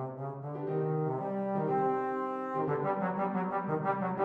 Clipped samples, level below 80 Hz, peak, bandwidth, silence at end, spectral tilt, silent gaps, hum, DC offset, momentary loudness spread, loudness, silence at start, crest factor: under 0.1%; -74 dBFS; -18 dBFS; 4.7 kHz; 0 s; -10.5 dB/octave; none; none; under 0.1%; 6 LU; -33 LUFS; 0 s; 14 dB